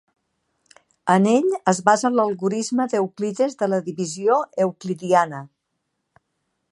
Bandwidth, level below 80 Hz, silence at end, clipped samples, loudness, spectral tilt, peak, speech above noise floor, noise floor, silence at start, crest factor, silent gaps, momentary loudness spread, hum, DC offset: 11.5 kHz; -74 dBFS; 1.25 s; under 0.1%; -21 LUFS; -5.5 dB/octave; -2 dBFS; 56 dB; -76 dBFS; 1.05 s; 20 dB; none; 9 LU; none; under 0.1%